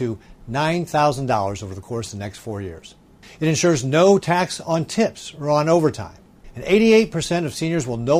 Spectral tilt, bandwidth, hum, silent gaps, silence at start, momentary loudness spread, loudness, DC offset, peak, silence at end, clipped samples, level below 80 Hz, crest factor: -5.5 dB/octave; 16 kHz; none; none; 0 s; 16 LU; -20 LUFS; under 0.1%; -4 dBFS; 0 s; under 0.1%; -50 dBFS; 16 dB